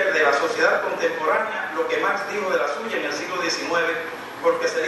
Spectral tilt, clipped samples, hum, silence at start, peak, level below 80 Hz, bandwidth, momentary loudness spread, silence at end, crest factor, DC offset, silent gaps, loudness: -2.5 dB/octave; under 0.1%; none; 0 s; -4 dBFS; -68 dBFS; 12.5 kHz; 6 LU; 0 s; 18 dB; under 0.1%; none; -22 LUFS